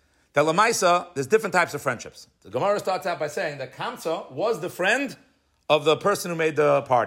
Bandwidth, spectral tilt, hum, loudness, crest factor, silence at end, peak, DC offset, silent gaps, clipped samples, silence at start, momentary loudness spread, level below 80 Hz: 16 kHz; -4 dB/octave; none; -24 LUFS; 18 dB; 0 s; -6 dBFS; under 0.1%; none; under 0.1%; 0.35 s; 12 LU; -70 dBFS